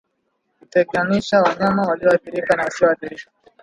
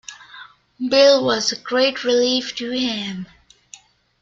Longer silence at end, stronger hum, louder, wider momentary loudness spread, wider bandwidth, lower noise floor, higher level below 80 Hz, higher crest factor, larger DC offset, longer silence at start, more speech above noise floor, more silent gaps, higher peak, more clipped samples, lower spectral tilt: second, 0.4 s vs 0.95 s; neither; about the same, -18 LUFS vs -18 LUFS; second, 7 LU vs 20 LU; first, 11 kHz vs 7.6 kHz; first, -71 dBFS vs -47 dBFS; about the same, -56 dBFS vs -60 dBFS; about the same, 18 dB vs 18 dB; neither; first, 0.75 s vs 0.1 s; first, 53 dB vs 29 dB; neither; about the same, -2 dBFS vs -2 dBFS; neither; first, -6 dB/octave vs -3 dB/octave